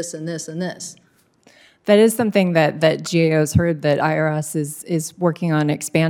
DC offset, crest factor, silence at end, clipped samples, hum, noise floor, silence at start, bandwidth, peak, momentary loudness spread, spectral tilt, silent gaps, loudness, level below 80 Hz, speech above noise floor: under 0.1%; 18 dB; 0 s; under 0.1%; none; -55 dBFS; 0 s; 18 kHz; 0 dBFS; 12 LU; -5.5 dB/octave; none; -19 LUFS; -50 dBFS; 37 dB